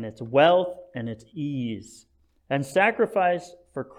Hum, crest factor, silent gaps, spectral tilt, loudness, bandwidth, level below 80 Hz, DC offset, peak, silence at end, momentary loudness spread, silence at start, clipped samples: none; 18 dB; none; -6 dB/octave; -24 LUFS; 14.5 kHz; -66 dBFS; under 0.1%; -6 dBFS; 0.15 s; 16 LU; 0 s; under 0.1%